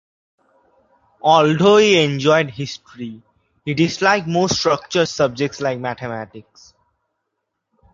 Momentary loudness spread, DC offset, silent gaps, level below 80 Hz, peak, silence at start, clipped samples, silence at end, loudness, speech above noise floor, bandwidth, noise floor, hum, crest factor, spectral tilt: 19 LU; under 0.1%; none; -56 dBFS; 0 dBFS; 1.25 s; under 0.1%; 1.5 s; -17 LUFS; 59 dB; 7.6 kHz; -76 dBFS; none; 18 dB; -4.5 dB/octave